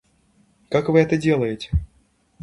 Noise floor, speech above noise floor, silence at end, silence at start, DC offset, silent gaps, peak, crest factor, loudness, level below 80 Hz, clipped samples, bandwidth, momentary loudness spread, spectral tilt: -61 dBFS; 42 dB; 0.6 s; 0.7 s; under 0.1%; none; -2 dBFS; 20 dB; -21 LUFS; -34 dBFS; under 0.1%; 11 kHz; 9 LU; -7.5 dB/octave